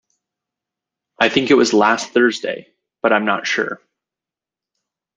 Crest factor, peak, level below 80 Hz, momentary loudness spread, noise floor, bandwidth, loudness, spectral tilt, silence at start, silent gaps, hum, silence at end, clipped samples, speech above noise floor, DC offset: 18 dB; -2 dBFS; -64 dBFS; 12 LU; -88 dBFS; 9.6 kHz; -16 LUFS; -3.5 dB/octave; 1.2 s; none; none; 1.4 s; under 0.1%; 72 dB; under 0.1%